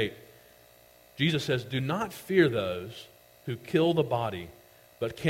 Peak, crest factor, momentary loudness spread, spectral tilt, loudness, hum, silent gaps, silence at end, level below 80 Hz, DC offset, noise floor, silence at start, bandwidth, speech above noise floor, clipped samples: -10 dBFS; 20 dB; 19 LU; -6 dB/octave; -29 LUFS; none; none; 0 s; -62 dBFS; under 0.1%; -57 dBFS; 0 s; 16.5 kHz; 29 dB; under 0.1%